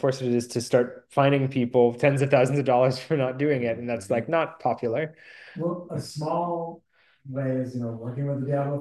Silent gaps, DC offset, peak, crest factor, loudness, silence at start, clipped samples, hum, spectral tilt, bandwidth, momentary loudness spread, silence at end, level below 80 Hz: none; under 0.1%; -6 dBFS; 18 dB; -25 LUFS; 0 s; under 0.1%; none; -7 dB/octave; 12.5 kHz; 11 LU; 0 s; -64 dBFS